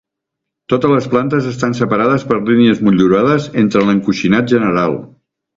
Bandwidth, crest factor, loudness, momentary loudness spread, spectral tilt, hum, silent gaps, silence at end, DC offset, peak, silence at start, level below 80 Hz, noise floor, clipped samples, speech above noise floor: 7.6 kHz; 14 dB; -13 LUFS; 6 LU; -7 dB/octave; none; none; 0.5 s; under 0.1%; 0 dBFS; 0.7 s; -48 dBFS; -79 dBFS; under 0.1%; 66 dB